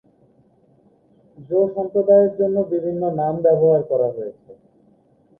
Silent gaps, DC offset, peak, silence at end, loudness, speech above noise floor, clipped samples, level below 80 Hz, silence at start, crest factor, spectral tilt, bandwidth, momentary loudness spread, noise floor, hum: none; under 0.1%; -4 dBFS; 0.85 s; -18 LUFS; 38 dB; under 0.1%; -62 dBFS; 1.4 s; 16 dB; -12.5 dB/octave; 2 kHz; 9 LU; -56 dBFS; none